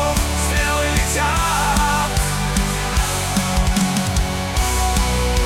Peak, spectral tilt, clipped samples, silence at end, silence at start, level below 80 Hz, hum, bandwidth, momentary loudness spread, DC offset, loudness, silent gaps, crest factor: -2 dBFS; -3.5 dB/octave; under 0.1%; 0 s; 0 s; -22 dBFS; none; 17 kHz; 3 LU; under 0.1%; -18 LUFS; none; 16 dB